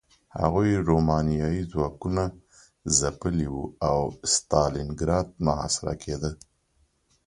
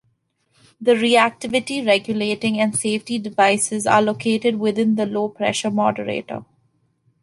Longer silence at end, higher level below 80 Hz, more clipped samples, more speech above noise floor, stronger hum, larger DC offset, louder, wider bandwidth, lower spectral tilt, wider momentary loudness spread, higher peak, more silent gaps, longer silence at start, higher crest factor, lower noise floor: about the same, 0.9 s vs 0.8 s; first, -40 dBFS vs -64 dBFS; neither; second, 42 dB vs 47 dB; neither; neither; second, -26 LUFS vs -19 LUFS; about the same, 11.5 kHz vs 11.5 kHz; about the same, -5 dB/octave vs -4 dB/octave; about the same, 9 LU vs 8 LU; about the same, -4 dBFS vs -2 dBFS; neither; second, 0.35 s vs 0.8 s; about the same, 22 dB vs 18 dB; about the same, -68 dBFS vs -67 dBFS